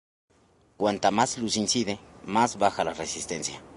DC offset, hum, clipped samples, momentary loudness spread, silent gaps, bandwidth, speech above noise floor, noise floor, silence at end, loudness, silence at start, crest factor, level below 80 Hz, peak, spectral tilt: under 0.1%; none; under 0.1%; 8 LU; none; 11.5 kHz; 36 dB; -62 dBFS; 0 s; -27 LUFS; 0.8 s; 20 dB; -60 dBFS; -8 dBFS; -3 dB/octave